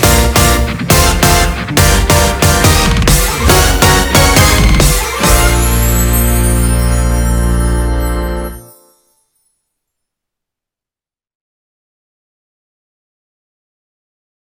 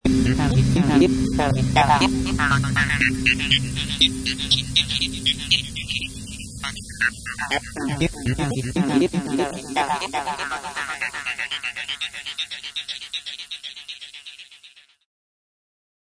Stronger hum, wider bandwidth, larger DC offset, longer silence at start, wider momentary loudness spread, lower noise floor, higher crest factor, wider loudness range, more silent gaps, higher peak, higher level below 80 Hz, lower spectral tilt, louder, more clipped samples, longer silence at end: neither; first, over 20 kHz vs 11 kHz; neither; about the same, 0 s vs 0.05 s; second, 7 LU vs 13 LU; first, under -90 dBFS vs -51 dBFS; second, 12 dB vs 20 dB; about the same, 11 LU vs 11 LU; neither; about the same, 0 dBFS vs -2 dBFS; first, -16 dBFS vs -36 dBFS; about the same, -4 dB/octave vs -4.5 dB/octave; first, -10 LUFS vs -21 LUFS; first, 0.5% vs under 0.1%; first, 5.9 s vs 1.4 s